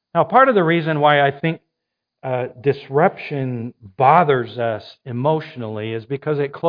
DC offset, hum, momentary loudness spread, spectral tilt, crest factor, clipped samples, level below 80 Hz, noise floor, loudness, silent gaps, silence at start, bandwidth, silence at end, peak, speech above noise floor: under 0.1%; none; 16 LU; -9.5 dB/octave; 18 dB; under 0.1%; -66 dBFS; -80 dBFS; -18 LUFS; none; 0.15 s; 5.2 kHz; 0 s; 0 dBFS; 62 dB